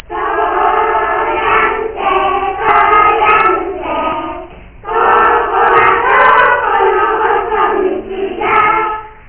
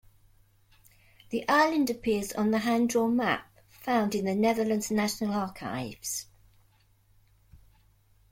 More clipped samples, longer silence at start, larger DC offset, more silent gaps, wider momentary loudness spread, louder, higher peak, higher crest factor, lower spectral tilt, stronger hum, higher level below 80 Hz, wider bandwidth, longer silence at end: first, 0.1% vs under 0.1%; second, 0.1 s vs 1.3 s; neither; neither; about the same, 10 LU vs 10 LU; first, -11 LUFS vs -28 LUFS; first, 0 dBFS vs -12 dBFS; second, 12 dB vs 18 dB; first, -7.5 dB/octave vs -4.5 dB/octave; neither; first, -38 dBFS vs -62 dBFS; second, 4 kHz vs 16.5 kHz; second, 0.15 s vs 0.75 s